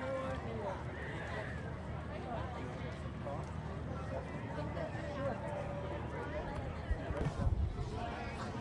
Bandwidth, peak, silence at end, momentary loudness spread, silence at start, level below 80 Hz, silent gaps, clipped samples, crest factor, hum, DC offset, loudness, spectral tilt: 11 kHz; -22 dBFS; 0 s; 5 LU; 0 s; -46 dBFS; none; under 0.1%; 18 dB; none; under 0.1%; -41 LUFS; -7 dB/octave